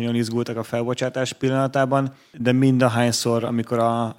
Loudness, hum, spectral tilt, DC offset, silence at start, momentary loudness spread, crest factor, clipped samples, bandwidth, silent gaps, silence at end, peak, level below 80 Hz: -21 LUFS; none; -5.5 dB/octave; under 0.1%; 0 s; 8 LU; 18 dB; under 0.1%; 16.5 kHz; none; 0.05 s; -4 dBFS; -64 dBFS